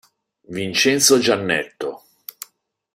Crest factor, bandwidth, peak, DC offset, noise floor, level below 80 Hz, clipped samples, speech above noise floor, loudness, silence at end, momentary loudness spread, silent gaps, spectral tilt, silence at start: 20 dB; 16 kHz; 0 dBFS; under 0.1%; -59 dBFS; -62 dBFS; under 0.1%; 40 dB; -17 LUFS; 1 s; 24 LU; none; -2.5 dB/octave; 0.5 s